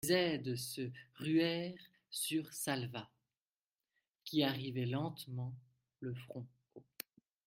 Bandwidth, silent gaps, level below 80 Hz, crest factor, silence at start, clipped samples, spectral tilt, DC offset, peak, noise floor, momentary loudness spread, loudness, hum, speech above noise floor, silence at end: 16 kHz; 3.42-3.46 s, 3.56-3.70 s, 4.08-4.12 s; -78 dBFS; 22 dB; 0.05 s; under 0.1%; -4.5 dB/octave; under 0.1%; -18 dBFS; under -90 dBFS; 17 LU; -39 LUFS; none; over 52 dB; 0.65 s